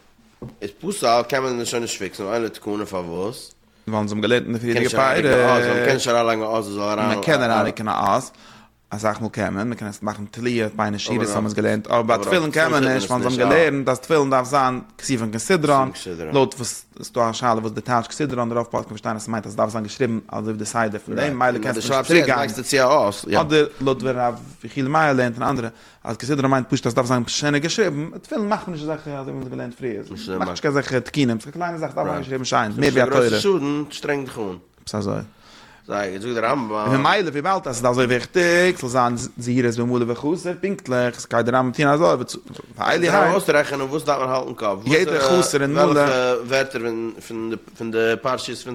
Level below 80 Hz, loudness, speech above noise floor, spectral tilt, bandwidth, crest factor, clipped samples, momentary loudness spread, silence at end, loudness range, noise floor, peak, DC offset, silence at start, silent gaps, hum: -54 dBFS; -21 LUFS; 27 dB; -5 dB/octave; 16.5 kHz; 20 dB; under 0.1%; 12 LU; 0 s; 6 LU; -47 dBFS; 0 dBFS; under 0.1%; 0.4 s; none; none